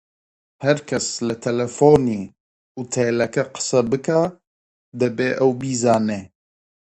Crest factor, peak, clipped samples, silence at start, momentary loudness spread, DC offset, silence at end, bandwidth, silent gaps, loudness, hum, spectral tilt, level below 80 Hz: 20 dB; 0 dBFS; under 0.1%; 0.6 s; 12 LU; under 0.1%; 0.65 s; 10.5 kHz; 2.40-2.75 s, 4.47-4.92 s; -20 LUFS; none; -5 dB/octave; -54 dBFS